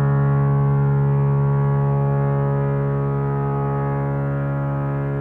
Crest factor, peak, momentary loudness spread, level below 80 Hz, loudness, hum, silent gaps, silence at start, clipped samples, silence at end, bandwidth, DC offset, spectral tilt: 10 dB; -10 dBFS; 5 LU; -40 dBFS; -20 LUFS; none; none; 0 s; under 0.1%; 0 s; 2.8 kHz; under 0.1%; -12 dB/octave